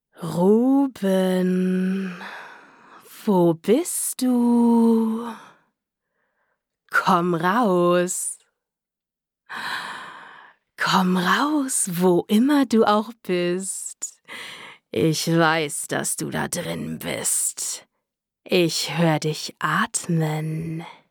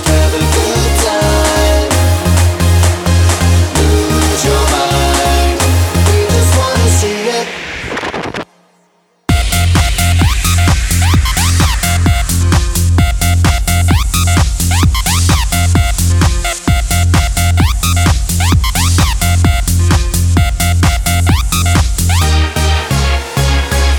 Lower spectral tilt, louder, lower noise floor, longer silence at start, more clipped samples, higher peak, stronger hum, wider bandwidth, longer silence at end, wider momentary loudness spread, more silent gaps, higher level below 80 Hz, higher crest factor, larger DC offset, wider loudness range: about the same, -4.5 dB/octave vs -4.5 dB/octave; second, -21 LUFS vs -11 LUFS; first, -87 dBFS vs -54 dBFS; first, 0.2 s vs 0 s; neither; second, -4 dBFS vs 0 dBFS; neither; about the same, 19.5 kHz vs 18.5 kHz; first, 0.2 s vs 0 s; first, 15 LU vs 3 LU; neither; second, -70 dBFS vs -16 dBFS; first, 18 dB vs 10 dB; neither; about the same, 4 LU vs 3 LU